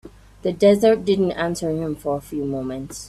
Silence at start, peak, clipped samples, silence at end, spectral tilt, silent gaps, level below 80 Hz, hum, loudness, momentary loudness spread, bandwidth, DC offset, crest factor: 0.05 s; -4 dBFS; under 0.1%; 0 s; -6 dB/octave; none; -48 dBFS; none; -21 LUFS; 12 LU; 14 kHz; under 0.1%; 16 dB